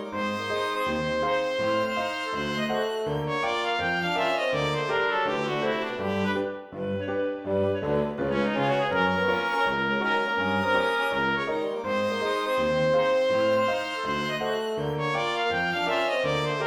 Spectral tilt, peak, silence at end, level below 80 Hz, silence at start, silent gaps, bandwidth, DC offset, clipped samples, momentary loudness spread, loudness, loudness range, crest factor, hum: -5 dB/octave; -10 dBFS; 0 s; -54 dBFS; 0 s; none; 18.5 kHz; under 0.1%; under 0.1%; 5 LU; -26 LUFS; 3 LU; 16 dB; none